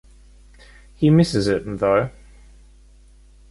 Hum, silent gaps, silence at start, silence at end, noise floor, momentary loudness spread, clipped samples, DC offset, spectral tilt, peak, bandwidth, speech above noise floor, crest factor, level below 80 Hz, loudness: none; none; 1 s; 1.4 s; -49 dBFS; 6 LU; under 0.1%; under 0.1%; -7 dB/octave; -4 dBFS; 11.5 kHz; 31 dB; 18 dB; -44 dBFS; -19 LUFS